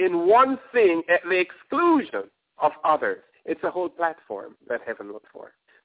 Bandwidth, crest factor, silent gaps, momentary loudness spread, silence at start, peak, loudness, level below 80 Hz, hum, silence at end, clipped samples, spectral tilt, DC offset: 4 kHz; 18 dB; none; 18 LU; 0 s; -6 dBFS; -23 LUFS; -70 dBFS; none; 0.4 s; under 0.1%; -8.5 dB/octave; under 0.1%